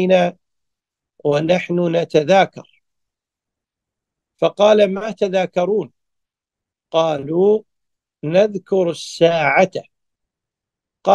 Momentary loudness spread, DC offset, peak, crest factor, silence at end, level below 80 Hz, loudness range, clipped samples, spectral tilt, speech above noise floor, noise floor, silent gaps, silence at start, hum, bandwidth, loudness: 8 LU; under 0.1%; 0 dBFS; 18 dB; 0 s; -66 dBFS; 2 LU; under 0.1%; -6 dB/octave; 70 dB; -86 dBFS; none; 0 s; none; 10 kHz; -17 LUFS